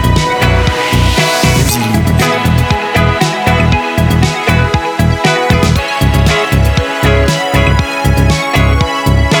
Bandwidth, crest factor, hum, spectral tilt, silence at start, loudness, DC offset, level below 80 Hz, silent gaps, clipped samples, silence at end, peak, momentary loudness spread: 19.5 kHz; 10 dB; none; -5 dB/octave; 0 s; -11 LUFS; under 0.1%; -18 dBFS; none; under 0.1%; 0 s; 0 dBFS; 2 LU